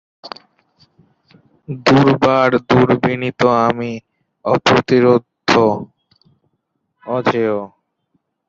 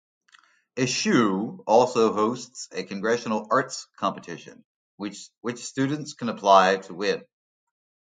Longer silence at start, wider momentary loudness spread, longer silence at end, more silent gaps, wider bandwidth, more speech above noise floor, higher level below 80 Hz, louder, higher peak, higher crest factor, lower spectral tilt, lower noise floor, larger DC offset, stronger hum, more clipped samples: second, 0.25 s vs 0.75 s; first, 22 LU vs 17 LU; about the same, 0.8 s vs 0.9 s; second, none vs 4.65-4.98 s; second, 7.8 kHz vs 9.6 kHz; first, 56 dB vs 35 dB; first, -50 dBFS vs -72 dBFS; first, -15 LUFS vs -24 LUFS; first, 0 dBFS vs -4 dBFS; second, 16 dB vs 22 dB; first, -6.5 dB/octave vs -4.5 dB/octave; first, -70 dBFS vs -59 dBFS; neither; neither; neither